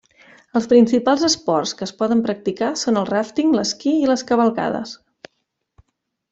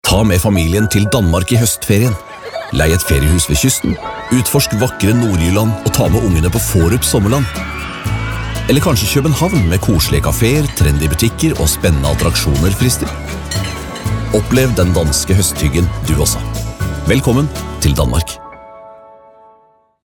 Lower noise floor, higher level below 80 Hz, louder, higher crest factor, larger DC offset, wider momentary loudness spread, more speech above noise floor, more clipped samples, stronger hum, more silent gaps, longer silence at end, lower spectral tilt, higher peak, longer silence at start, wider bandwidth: first, -74 dBFS vs -51 dBFS; second, -60 dBFS vs -24 dBFS; second, -19 LUFS vs -14 LUFS; about the same, 18 dB vs 14 dB; neither; about the same, 9 LU vs 8 LU; first, 56 dB vs 38 dB; neither; neither; neither; first, 1.35 s vs 1.1 s; about the same, -4 dB/octave vs -5 dB/octave; about the same, -2 dBFS vs 0 dBFS; first, 0.55 s vs 0.05 s; second, 8 kHz vs 19 kHz